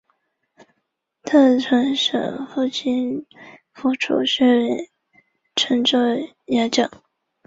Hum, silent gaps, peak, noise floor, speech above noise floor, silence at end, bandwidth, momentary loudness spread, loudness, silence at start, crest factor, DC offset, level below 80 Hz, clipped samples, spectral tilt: none; none; -4 dBFS; -75 dBFS; 56 dB; 0.6 s; 7.8 kHz; 11 LU; -19 LUFS; 1.25 s; 16 dB; under 0.1%; -64 dBFS; under 0.1%; -3.5 dB/octave